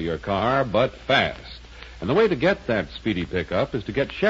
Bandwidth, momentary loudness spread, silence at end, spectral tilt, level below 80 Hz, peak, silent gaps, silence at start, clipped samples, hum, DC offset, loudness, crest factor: 7.8 kHz; 14 LU; 0 s; -6.5 dB/octave; -44 dBFS; -6 dBFS; none; 0 s; under 0.1%; none; under 0.1%; -23 LUFS; 16 dB